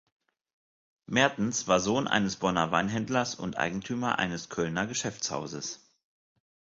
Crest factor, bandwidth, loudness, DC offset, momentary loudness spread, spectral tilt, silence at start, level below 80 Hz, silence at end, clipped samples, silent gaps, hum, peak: 22 dB; 7.8 kHz; -29 LUFS; under 0.1%; 8 LU; -4 dB/octave; 1.1 s; -60 dBFS; 1 s; under 0.1%; none; none; -8 dBFS